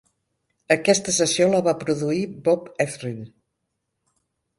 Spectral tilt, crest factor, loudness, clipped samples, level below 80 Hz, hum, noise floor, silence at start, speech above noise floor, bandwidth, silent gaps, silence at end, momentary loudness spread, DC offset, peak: -4 dB/octave; 22 dB; -21 LUFS; under 0.1%; -64 dBFS; none; -78 dBFS; 0.7 s; 56 dB; 11.5 kHz; none; 1.3 s; 10 LU; under 0.1%; -2 dBFS